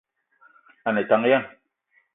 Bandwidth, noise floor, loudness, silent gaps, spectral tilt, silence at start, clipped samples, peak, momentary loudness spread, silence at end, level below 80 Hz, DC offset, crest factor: 4 kHz; -66 dBFS; -22 LUFS; none; -10 dB/octave; 0.85 s; under 0.1%; -6 dBFS; 13 LU; 0.65 s; -74 dBFS; under 0.1%; 20 dB